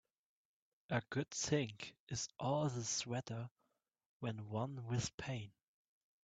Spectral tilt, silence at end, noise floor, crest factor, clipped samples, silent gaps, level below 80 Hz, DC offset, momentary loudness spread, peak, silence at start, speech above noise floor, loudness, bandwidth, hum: -4.5 dB/octave; 0.75 s; -85 dBFS; 22 dB; under 0.1%; 2.00-2.07 s, 3.51-3.56 s, 4.06-4.20 s, 5.14-5.18 s; -72 dBFS; under 0.1%; 10 LU; -20 dBFS; 0.9 s; 43 dB; -42 LUFS; 9 kHz; none